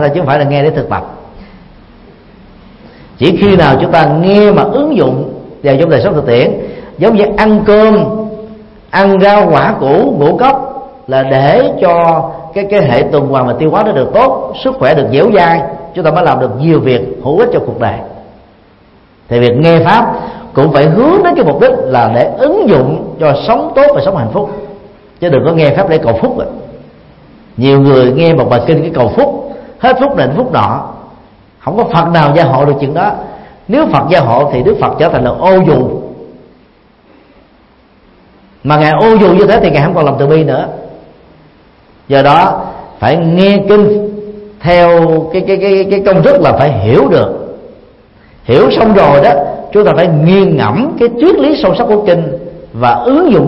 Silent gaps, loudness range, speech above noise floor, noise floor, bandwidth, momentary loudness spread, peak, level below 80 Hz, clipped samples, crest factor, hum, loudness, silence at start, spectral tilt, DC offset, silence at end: none; 4 LU; 37 dB; -44 dBFS; 5.8 kHz; 12 LU; 0 dBFS; -36 dBFS; 0.4%; 8 dB; none; -9 LUFS; 0 s; -9 dB/octave; under 0.1%; 0 s